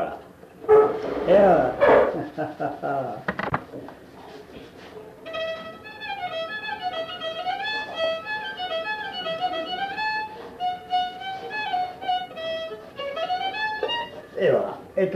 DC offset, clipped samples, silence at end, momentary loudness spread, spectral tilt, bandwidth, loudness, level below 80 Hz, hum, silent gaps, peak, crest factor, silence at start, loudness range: under 0.1%; under 0.1%; 0 s; 21 LU; -5.5 dB/octave; 14 kHz; -25 LUFS; -56 dBFS; none; none; -6 dBFS; 20 dB; 0 s; 12 LU